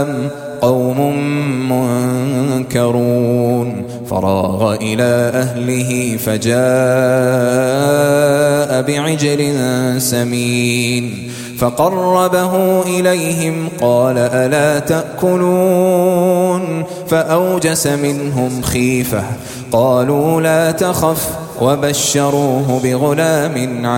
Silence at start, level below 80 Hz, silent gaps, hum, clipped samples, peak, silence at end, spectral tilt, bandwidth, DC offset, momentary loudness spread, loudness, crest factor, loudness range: 0 s; -44 dBFS; none; none; under 0.1%; 0 dBFS; 0 s; -5.5 dB/octave; 17 kHz; under 0.1%; 6 LU; -14 LUFS; 14 dB; 2 LU